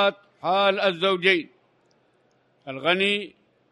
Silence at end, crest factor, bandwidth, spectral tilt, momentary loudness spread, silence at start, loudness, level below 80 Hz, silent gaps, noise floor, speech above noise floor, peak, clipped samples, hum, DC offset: 0.4 s; 20 dB; 11 kHz; -5 dB/octave; 16 LU; 0 s; -22 LUFS; -78 dBFS; none; -64 dBFS; 42 dB; -6 dBFS; under 0.1%; none; under 0.1%